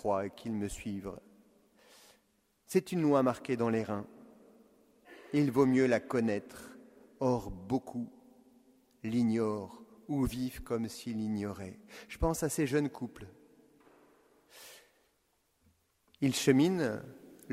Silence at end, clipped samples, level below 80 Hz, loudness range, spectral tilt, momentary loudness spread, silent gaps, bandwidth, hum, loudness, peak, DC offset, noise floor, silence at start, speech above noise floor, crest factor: 0 s; under 0.1%; -56 dBFS; 5 LU; -6 dB/octave; 24 LU; none; 16 kHz; none; -33 LUFS; -12 dBFS; under 0.1%; -75 dBFS; 0.05 s; 43 dB; 22 dB